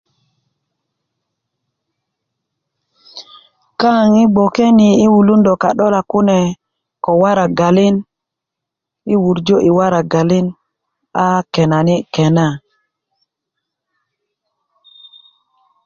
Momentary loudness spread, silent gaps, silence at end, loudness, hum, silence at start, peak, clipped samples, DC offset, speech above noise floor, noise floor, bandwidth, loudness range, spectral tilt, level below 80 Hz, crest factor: 14 LU; none; 3.3 s; -13 LUFS; none; 3.15 s; -2 dBFS; under 0.1%; under 0.1%; 70 dB; -81 dBFS; 7.2 kHz; 7 LU; -7 dB/octave; -52 dBFS; 14 dB